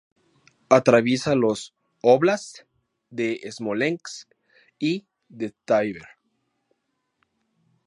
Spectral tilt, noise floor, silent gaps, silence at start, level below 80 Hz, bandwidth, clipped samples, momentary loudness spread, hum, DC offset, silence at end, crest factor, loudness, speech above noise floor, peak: -5.5 dB/octave; -76 dBFS; none; 0.7 s; -68 dBFS; 11 kHz; under 0.1%; 20 LU; none; under 0.1%; 1.85 s; 24 dB; -23 LUFS; 54 dB; 0 dBFS